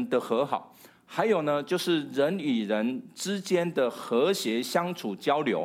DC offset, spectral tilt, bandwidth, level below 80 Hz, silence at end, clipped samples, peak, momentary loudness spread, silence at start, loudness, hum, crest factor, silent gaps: under 0.1%; -5 dB/octave; 16 kHz; -80 dBFS; 0 s; under 0.1%; -10 dBFS; 7 LU; 0 s; -28 LUFS; none; 18 dB; none